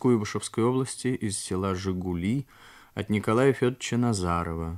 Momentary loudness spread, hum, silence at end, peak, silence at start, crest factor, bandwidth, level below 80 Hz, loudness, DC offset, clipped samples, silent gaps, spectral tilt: 7 LU; none; 0 s; -10 dBFS; 0 s; 18 dB; 14.5 kHz; -50 dBFS; -27 LUFS; under 0.1%; under 0.1%; none; -6 dB/octave